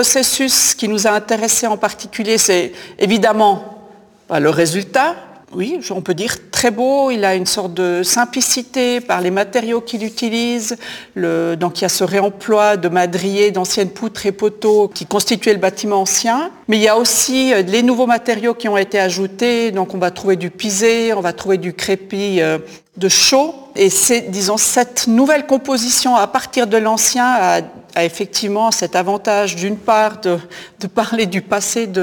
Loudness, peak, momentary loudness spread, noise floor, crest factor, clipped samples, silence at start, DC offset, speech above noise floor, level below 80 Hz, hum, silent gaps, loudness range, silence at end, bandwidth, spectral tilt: -15 LUFS; 0 dBFS; 8 LU; -43 dBFS; 14 dB; under 0.1%; 0 s; under 0.1%; 27 dB; -56 dBFS; none; none; 4 LU; 0 s; 19.5 kHz; -2.5 dB/octave